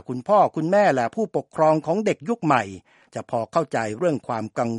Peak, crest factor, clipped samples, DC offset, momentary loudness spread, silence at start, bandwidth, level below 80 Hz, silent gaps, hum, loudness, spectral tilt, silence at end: -4 dBFS; 20 dB; under 0.1%; under 0.1%; 9 LU; 0.1 s; 11 kHz; -66 dBFS; none; none; -22 LUFS; -6.5 dB/octave; 0 s